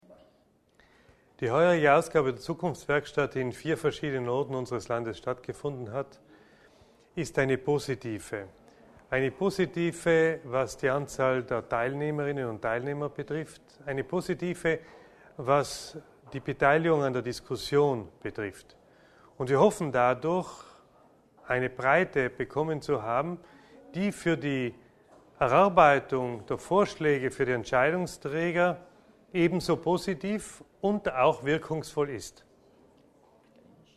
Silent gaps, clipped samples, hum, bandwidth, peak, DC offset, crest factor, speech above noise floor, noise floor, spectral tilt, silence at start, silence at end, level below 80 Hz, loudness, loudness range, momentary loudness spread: none; under 0.1%; none; 13.5 kHz; -6 dBFS; under 0.1%; 24 dB; 38 dB; -66 dBFS; -6 dB/octave; 0.1 s; 1.65 s; -60 dBFS; -28 LUFS; 7 LU; 13 LU